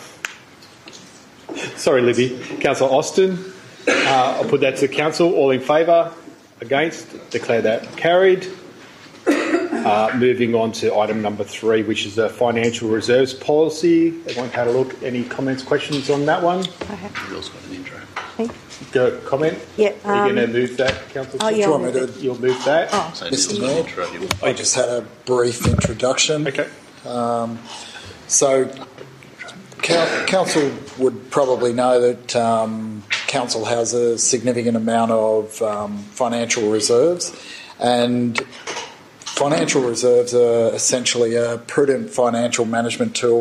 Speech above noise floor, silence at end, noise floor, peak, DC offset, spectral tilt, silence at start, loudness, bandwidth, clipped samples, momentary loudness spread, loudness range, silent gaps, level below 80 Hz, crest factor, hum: 26 dB; 0 s; -44 dBFS; -4 dBFS; under 0.1%; -3.5 dB/octave; 0 s; -19 LUFS; 14 kHz; under 0.1%; 13 LU; 4 LU; none; -50 dBFS; 16 dB; none